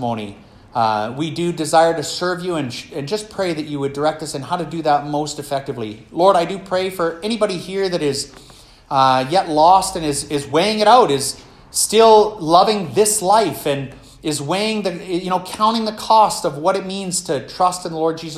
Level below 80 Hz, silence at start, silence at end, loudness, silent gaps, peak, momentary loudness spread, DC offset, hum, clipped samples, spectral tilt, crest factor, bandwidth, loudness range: -50 dBFS; 0 s; 0 s; -18 LUFS; none; 0 dBFS; 12 LU; under 0.1%; none; under 0.1%; -4 dB/octave; 18 dB; 15 kHz; 6 LU